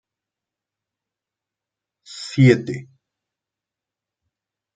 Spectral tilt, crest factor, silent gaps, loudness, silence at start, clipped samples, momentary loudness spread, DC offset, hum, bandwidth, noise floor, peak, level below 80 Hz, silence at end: -7 dB/octave; 24 dB; none; -17 LUFS; 2.1 s; under 0.1%; 19 LU; under 0.1%; none; 9 kHz; -87 dBFS; -2 dBFS; -62 dBFS; 1.9 s